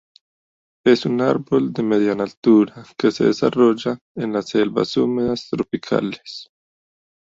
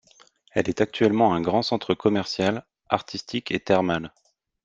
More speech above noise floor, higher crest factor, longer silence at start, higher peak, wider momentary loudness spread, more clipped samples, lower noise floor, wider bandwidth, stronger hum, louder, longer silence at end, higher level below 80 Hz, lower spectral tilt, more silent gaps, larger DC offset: first, over 71 dB vs 34 dB; about the same, 18 dB vs 22 dB; first, 0.85 s vs 0.55 s; about the same, -2 dBFS vs -2 dBFS; about the same, 9 LU vs 9 LU; neither; first, under -90 dBFS vs -57 dBFS; about the same, 7.8 kHz vs 7.8 kHz; neither; first, -19 LUFS vs -24 LUFS; first, 0.85 s vs 0.55 s; about the same, -58 dBFS vs -58 dBFS; about the same, -6.5 dB/octave vs -6 dB/octave; first, 2.37-2.43 s, 4.01-4.15 s vs none; neither